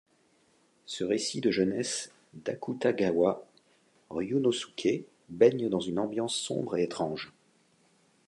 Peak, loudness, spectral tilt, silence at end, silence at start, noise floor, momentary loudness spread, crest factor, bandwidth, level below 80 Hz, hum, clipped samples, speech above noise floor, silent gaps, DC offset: -8 dBFS; -30 LUFS; -4.5 dB/octave; 1 s; 0.9 s; -67 dBFS; 14 LU; 22 dB; 11.5 kHz; -68 dBFS; none; under 0.1%; 38 dB; none; under 0.1%